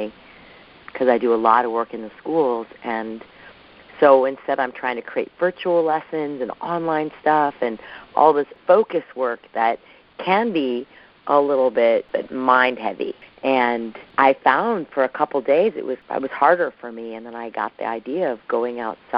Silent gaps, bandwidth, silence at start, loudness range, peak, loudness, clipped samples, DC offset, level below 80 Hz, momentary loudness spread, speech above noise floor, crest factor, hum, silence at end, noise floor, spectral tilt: none; 5.4 kHz; 0 s; 3 LU; 0 dBFS; -20 LUFS; under 0.1%; under 0.1%; -64 dBFS; 13 LU; 26 dB; 20 dB; none; 0 s; -46 dBFS; -3 dB/octave